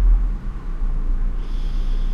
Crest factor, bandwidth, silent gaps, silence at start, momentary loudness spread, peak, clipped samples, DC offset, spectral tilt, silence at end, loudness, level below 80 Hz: 12 dB; 3.8 kHz; none; 0 s; 8 LU; -8 dBFS; under 0.1%; under 0.1%; -7.5 dB/octave; 0 s; -27 LUFS; -18 dBFS